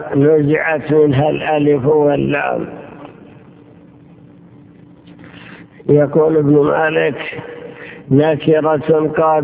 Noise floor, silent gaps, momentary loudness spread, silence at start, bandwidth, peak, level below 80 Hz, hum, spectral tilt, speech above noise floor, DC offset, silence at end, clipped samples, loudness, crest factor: -42 dBFS; none; 20 LU; 0 s; 4 kHz; 0 dBFS; -48 dBFS; none; -11.5 dB/octave; 29 dB; under 0.1%; 0 s; under 0.1%; -14 LUFS; 14 dB